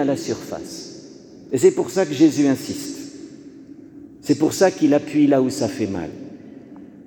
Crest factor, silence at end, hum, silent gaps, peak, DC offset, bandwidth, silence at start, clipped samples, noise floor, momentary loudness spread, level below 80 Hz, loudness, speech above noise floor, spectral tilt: 18 dB; 0.05 s; none; none; -2 dBFS; under 0.1%; 19 kHz; 0 s; under 0.1%; -42 dBFS; 24 LU; -60 dBFS; -19 LUFS; 23 dB; -5.5 dB/octave